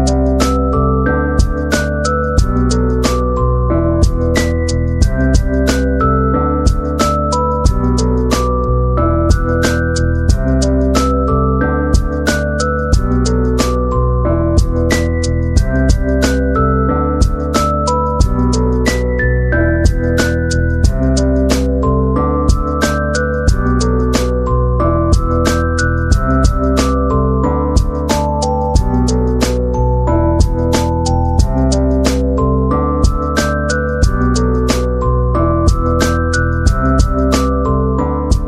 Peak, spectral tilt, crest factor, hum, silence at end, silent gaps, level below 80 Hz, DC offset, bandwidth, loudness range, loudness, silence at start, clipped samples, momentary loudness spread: 0 dBFS; -6 dB/octave; 12 dB; none; 0 s; none; -16 dBFS; under 0.1%; 13.5 kHz; 1 LU; -14 LUFS; 0 s; under 0.1%; 2 LU